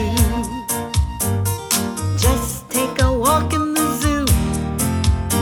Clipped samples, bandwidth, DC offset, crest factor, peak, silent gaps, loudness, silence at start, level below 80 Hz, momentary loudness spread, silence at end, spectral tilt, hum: under 0.1%; over 20 kHz; under 0.1%; 16 dB; -4 dBFS; none; -19 LUFS; 0 s; -26 dBFS; 5 LU; 0 s; -4.5 dB/octave; none